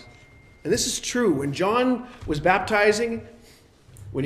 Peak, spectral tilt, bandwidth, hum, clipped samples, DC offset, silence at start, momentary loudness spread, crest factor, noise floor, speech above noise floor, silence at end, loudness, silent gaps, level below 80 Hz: -6 dBFS; -4 dB/octave; 14.5 kHz; none; under 0.1%; under 0.1%; 0 s; 11 LU; 20 dB; -52 dBFS; 30 dB; 0 s; -23 LUFS; none; -48 dBFS